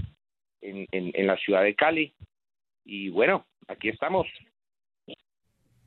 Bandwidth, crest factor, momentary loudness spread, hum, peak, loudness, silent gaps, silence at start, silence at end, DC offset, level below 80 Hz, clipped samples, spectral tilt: 4.3 kHz; 22 dB; 18 LU; none; -6 dBFS; -26 LUFS; none; 0 s; 0.75 s; under 0.1%; -64 dBFS; under 0.1%; -8.5 dB/octave